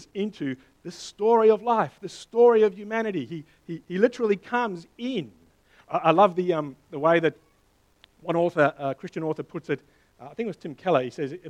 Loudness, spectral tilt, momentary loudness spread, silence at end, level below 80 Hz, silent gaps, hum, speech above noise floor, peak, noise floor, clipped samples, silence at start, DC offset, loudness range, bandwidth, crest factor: -25 LUFS; -6.5 dB/octave; 19 LU; 0 s; -68 dBFS; none; none; 39 dB; -4 dBFS; -64 dBFS; under 0.1%; 0 s; under 0.1%; 5 LU; 9.6 kHz; 20 dB